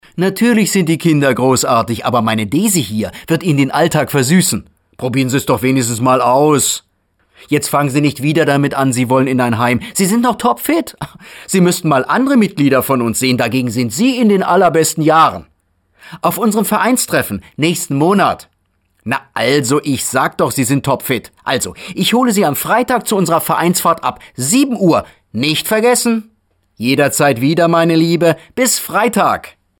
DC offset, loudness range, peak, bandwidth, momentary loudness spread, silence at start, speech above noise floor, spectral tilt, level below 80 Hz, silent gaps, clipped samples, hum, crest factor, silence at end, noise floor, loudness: under 0.1%; 2 LU; -2 dBFS; 19.5 kHz; 7 LU; 0.15 s; 48 dB; -4.5 dB/octave; -50 dBFS; none; under 0.1%; none; 12 dB; 0.3 s; -61 dBFS; -13 LUFS